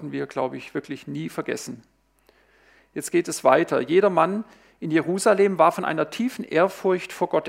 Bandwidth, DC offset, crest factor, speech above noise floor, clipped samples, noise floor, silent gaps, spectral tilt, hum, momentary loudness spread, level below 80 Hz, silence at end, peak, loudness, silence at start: 16 kHz; under 0.1%; 20 dB; 39 dB; under 0.1%; -61 dBFS; none; -5 dB/octave; none; 15 LU; -70 dBFS; 0 s; -2 dBFS; -23 LUFS; 0 s